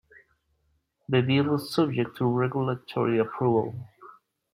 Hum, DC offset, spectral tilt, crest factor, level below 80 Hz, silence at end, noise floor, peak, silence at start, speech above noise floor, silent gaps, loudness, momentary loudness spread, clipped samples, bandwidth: none; under 0.1%; -7.5 dB/octave; 18 dB; -66 dBFS; 0.4 s; -72 dBFS; -10 dBFS; 1.1 s; 47 dB; none; -26 LUFS; 6 LU; under 0.1%; 15 kHz